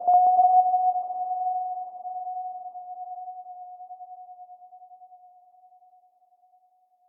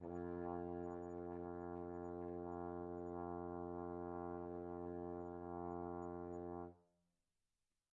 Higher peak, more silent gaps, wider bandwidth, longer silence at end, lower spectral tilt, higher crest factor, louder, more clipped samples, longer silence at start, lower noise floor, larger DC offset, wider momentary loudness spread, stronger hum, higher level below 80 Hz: first, -10 dBFS vs -34 dBFS; neither; second, 1.3 kHz vs 7 kHz; first, 1.9 s vs 1.1 s; second, 0.5 dB/octave vs -10 dB/octave; about the same, 16 dB vs 16 dB; first, -24 LUFS vs -49 LUFS; neither; about the same, 0 s vs 0 s; second, -65 dBFS vs under -90 dBFS; neither; first, 25 LU vs 2 LU; neither; second, under -90 dBFS vs -78 dBFS